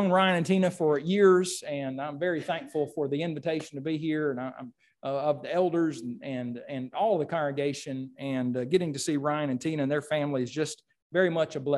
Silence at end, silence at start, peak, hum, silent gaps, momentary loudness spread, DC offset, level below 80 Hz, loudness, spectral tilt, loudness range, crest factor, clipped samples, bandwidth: 0 s; 0 s; -10 dBFS; none; 11.02-11.10 s; 12 LU; under 0.1%; -74 dBFS; -29 LUFS; -5.5 dB/octave; 4 LU; 18 dB; under 0.1%; 12.5 kHz